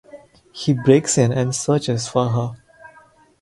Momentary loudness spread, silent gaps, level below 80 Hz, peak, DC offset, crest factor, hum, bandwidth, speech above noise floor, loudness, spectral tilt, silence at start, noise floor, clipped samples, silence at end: 10 LU; none; -54 dBFS; 0 dBFS; under 0.1%; 20 dB; none; 11.5 kHz; 33 dB; -19 LUFS; -5.5 dB/octave; 0.15 s; -51 dBFS; under 0.1%; 0.55 s